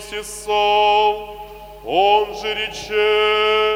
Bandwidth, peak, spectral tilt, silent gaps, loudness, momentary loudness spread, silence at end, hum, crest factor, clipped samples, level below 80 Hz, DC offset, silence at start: 16 kHz; -4 dBFS; -2 dB/octave; none; -17 LUFS; 17 LU; 0 s; none; 14 dB; under 0.1%; -46 dBFS; under 0.1%; 0 s